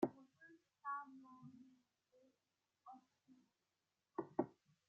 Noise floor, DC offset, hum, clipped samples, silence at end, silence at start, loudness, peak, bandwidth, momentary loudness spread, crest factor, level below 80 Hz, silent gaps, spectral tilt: under -90 dBFS; under 0.1%; none; under 0.1%; 0.35 s; 0 s; -49 LUFS; -24 dBFS; 7.2 kHz; 21 LU; 28 dB; under -90 dBFS; none; -7 dB/octave